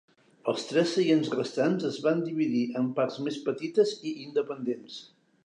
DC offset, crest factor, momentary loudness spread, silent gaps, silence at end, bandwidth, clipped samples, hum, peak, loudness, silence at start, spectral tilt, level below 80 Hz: under 0.1%; 18 dB; 9 LU; none; 0.4 s; 10.5 kHz; under 0.1%; none; -12 dBFS; -28 LUFS; 0.45 s; -6 dB/octave; -82 dBFS